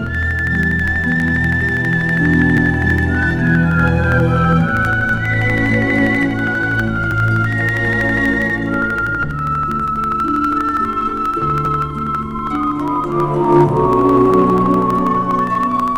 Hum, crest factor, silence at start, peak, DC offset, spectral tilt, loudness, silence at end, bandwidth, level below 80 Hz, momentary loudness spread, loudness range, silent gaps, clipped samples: none; 12 dB; 0 s; -2 dBFS; under 0.1%; -8 dB/octave; -15 LUFS; 0 s; 13 kHz; -30 dBFS; 6 LU; 3 LU; none; under 0.1%